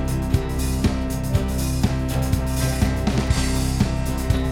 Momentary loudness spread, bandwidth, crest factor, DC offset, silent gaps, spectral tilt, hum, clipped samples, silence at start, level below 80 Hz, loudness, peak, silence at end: 2 LU; 17 kHz; 16 dB; under 0.1%; none; -5.5 dB/octave; none; under 0.1%; 0 s; -26 dBFS; -23 LUFS; -6 dBFS; 0 s